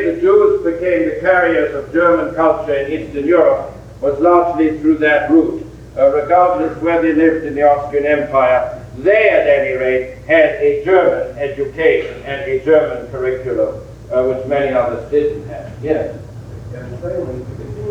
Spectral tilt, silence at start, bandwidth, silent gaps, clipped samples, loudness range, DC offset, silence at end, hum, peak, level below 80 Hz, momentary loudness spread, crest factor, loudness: -7.5 dB/octave; 0 s; 8.4 kHz; none; under 0.1%; 5 LU; under 0.1%; 0 s; none; 0 dBFS; -40 dBFS; 14 LU; 14 dB; -15 LUFS